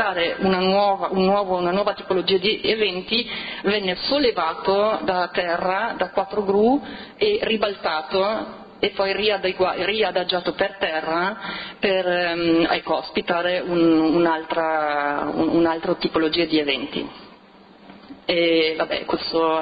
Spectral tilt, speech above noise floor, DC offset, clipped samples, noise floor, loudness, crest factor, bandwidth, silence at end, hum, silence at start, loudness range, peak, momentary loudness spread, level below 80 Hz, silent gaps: -8.5 dB/octave; 27 dB; under 0.1%; under 0.1%; -48 dBFS; -21 LUFS; 14 dB; 5 kHz; 0 s; none; 0 s; 2 LU; -6 dBFS; 6 LU; -54 dBFS; none